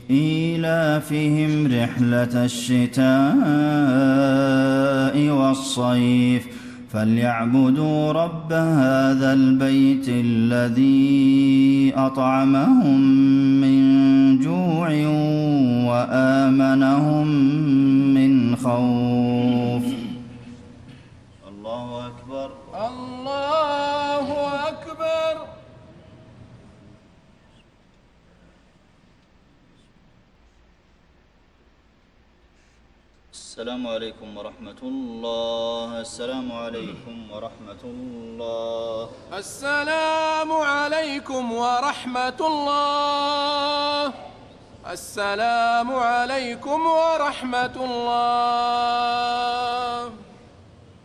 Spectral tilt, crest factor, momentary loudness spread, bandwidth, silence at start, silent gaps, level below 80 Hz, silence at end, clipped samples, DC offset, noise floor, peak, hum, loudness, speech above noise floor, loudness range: -6.5 dB/octave; 14 dB; 18 LU; 12.5 kHz; 0 s; none; -56 dBFS; 0.8 s; under 0.1%; under 0.1%; -57 dBFS; -8 dBFS; none; -20 LUFS; 38 dB; 15 LU